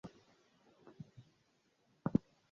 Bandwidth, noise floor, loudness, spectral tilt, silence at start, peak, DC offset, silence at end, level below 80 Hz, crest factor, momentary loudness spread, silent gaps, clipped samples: 7.4 kHz; -77 dBFS; -39 LUFS; -9.5 dB/octave; 0.05 s; -16 dBFS; under 0.1%; 0.35 s; -68 dBFS; 28 dB; 19 LU; none; under 0.1%